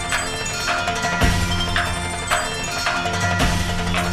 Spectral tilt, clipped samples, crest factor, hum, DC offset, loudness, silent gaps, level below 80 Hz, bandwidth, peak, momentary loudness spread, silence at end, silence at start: -3.5 dB/octave; under 0.1%; 18 dB; none; under 0.1%; -21 LUFS; none; -30 dBFS; 14.5 kHz; -4 dBFS; 4 LU; 0 s; 0 s